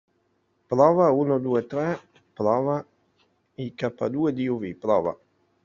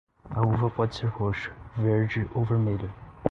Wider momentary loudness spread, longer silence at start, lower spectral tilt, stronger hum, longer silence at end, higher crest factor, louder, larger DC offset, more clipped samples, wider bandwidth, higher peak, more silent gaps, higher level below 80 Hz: first, 12 LU vs 9 LU; first, 0.7 s vs 0.25 s; about the same, -7.5 dB/octave vs -8.5 dB/octave; neither; first, 0.5 s vs 0 s; about the same, 20 dB vs 22 dB; first, -24 LUFS vs -28 LUFS; neither; neither; about the same, 7.2 kHz vs 6.6 kHz; about the same, -4 dBFS vs -6 dBFS; neither; second, -66 dBFS vs -48 dBFS